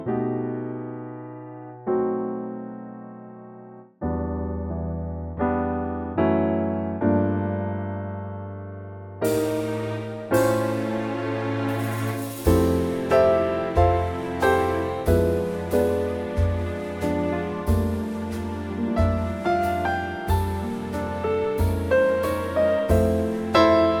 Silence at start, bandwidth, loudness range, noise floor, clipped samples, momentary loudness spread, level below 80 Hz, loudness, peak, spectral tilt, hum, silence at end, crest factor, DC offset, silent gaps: 0 s; 19 kHz; 8 LU; -44 dBFS; under 0.1%; 14 LU; -38 dBFS; -24 LUFS; -6 dBFS; -7 dB/octave; none; 0 s; 18 dB; under 0.1%; none